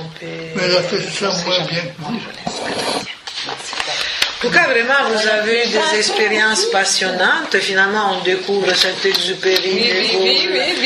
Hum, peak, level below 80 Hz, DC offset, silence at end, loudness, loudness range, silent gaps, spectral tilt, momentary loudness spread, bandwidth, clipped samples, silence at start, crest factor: none; 0 dBFS; -58 dBFS; under 0.1%; 0 s; -15 LUFS; 6 LU; none; -2 dB/octave; 11 LU; 15.5 kHz; under 0.1%; 0 s; 16 dB